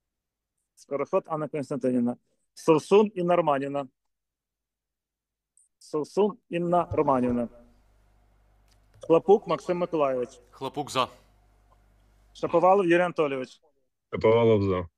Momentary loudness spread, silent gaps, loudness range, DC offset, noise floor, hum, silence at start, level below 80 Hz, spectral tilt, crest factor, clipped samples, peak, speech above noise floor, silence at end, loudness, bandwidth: 15 LU; none; 5 LU; under 0.1%; -88 dBFS; none; 0.9 s; -60 dBFS; -6.5 dB/octave; 18 dB; under 0.1%; -8 dBFS; 64 dB; 0.1 s; -25 LUFS; 12.5 kHz